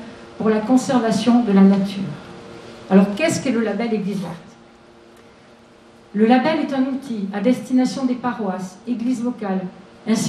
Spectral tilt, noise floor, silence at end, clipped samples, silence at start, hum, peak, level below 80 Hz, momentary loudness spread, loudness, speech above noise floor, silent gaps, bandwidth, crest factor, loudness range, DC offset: -6 dB/octave; -47 dBFS; 0 s; under 0.1%; 0 s; none; 0 dBFS; -60 dBFS; 17 LU; -19 LUFS; 29 dB; none; 13 kHz; 18 dB; 5 LU; under 0.1%